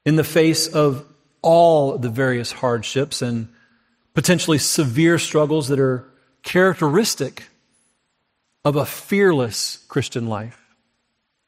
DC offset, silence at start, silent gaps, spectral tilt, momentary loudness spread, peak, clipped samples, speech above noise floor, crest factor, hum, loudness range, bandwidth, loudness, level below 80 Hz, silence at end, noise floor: under 0.1%; 0.05 s; none; -5 dB/octave; 10 LU; -4 dBFS; under 0.1%; 54 dB; 16 dB; none; 4 LU; 16 kHz; -19 LUFS; -60 dBFS; 0.95 s; -72 dBFS